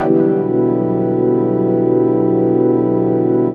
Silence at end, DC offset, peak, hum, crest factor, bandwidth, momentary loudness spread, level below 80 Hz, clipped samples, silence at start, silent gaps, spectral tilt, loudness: 0 s; under 0.1%; 0 dBFS; none; 14 dB; 3.4 kHz; 2 LU; -54 dBFS; under 0.1%; 0 s; none; -12.5 dB/octave; -15 LUFS